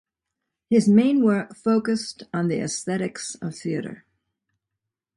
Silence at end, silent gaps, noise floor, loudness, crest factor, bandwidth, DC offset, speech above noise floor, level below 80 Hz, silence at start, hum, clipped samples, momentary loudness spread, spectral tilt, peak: 1.2 s; none; -84 dBFS; -23 LUFS; 18 dB; 11 kHz; under 0.1%; 62 dB; -64 dBFS; 0.7 s; none; under 0.1%; 14 LU; -5.5 dB/octave; -6 dBFS